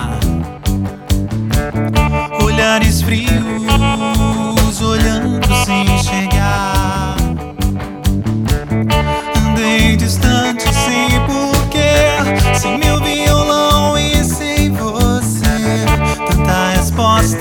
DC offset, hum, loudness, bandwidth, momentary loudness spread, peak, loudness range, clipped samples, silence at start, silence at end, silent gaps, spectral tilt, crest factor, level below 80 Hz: under 0.1%; none; -14 LUFS; 19 kHz; 6 LU; 0 dBFS; 3 LU; under 0.1%; 0 s; 0 s; none; -5 dB/octave; 12 dB; -20 dBFS